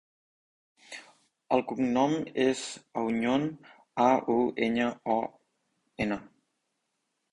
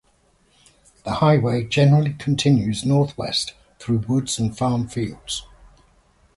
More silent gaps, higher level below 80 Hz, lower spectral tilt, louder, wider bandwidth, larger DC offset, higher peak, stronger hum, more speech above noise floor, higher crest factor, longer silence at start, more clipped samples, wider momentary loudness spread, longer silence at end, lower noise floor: neither; second, -66 dBFS vs -48 dBFS; about the same, -5.5 dB/octave vs -6 dB/octave; second, -29 LUFS vs -21 LUFS; about the same, 11 kHz vs 11.5 kHz; neither; second, -10 dBFS vs -4 dBFS; neither; first, 52 dB vs 41 dB; about the same, 22 dB vs 18 dB; second, 0.9 s vs 1.05 s; neither; about the same, 14 LU vs 13 LU; first, 1.1 s vs 0.9 s; first, -80 dBFS vs -60 dBFS